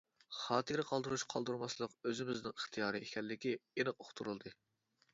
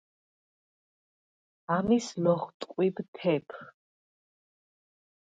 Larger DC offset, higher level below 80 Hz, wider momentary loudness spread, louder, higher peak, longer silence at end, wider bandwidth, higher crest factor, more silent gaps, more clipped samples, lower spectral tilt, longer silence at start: neither; second, -78 dBFS vs -68 dBFS; second, 8 LU vs 18 LU; second, -41 LUFS vs -29 LUFS; second, -20 dBFS vs -12 dBFS; second, 0.6 s vs 1.5 s; second, 7.6 kHz vs 9.2 kHz; about the same, 22 dB vs 20 dB; second, none vs 2.54-2.60 s, 3.08-3.13 s; neither; second, -3 dB/octave vs -6.5 dB/octave; second, 0.3 s vs 1.7 s